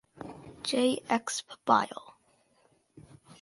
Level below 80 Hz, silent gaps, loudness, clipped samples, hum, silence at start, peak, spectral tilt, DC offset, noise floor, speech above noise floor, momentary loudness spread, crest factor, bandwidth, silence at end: -70 dBFS; none; -29 LUFS; under 0.1%; none; 0.2 s; -8 dBFS; -3 dB/octave; under 0.1%; -68 dBFS; 39 dB; 19 LU; 24 dB; 11.5 kHz; 0.1 s